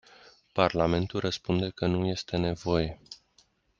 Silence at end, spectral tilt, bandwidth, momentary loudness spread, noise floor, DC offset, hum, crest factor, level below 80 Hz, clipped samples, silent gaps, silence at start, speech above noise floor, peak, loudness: 0.65 s; -6.5 dB/octave; 7.4 kHz; 11 LU; -66 dBFS; under 0.1%; none; 24 dB; -52 dBFS; under 0.1%; none; 0.55 s; 38 dB; -6 dBFS; -29 LUFS